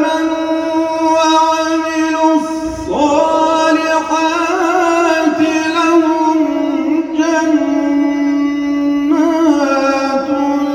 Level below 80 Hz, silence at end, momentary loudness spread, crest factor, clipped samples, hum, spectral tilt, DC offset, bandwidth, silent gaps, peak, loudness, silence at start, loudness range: -46 dBFS; 0 s; 4 LU; 12 dB; under 0.1%; none; -3.5 dB/octave; under 0.1%; 12.5 kHz; none; 0 dBFS; -13 LUFS; 0 s; 1 LU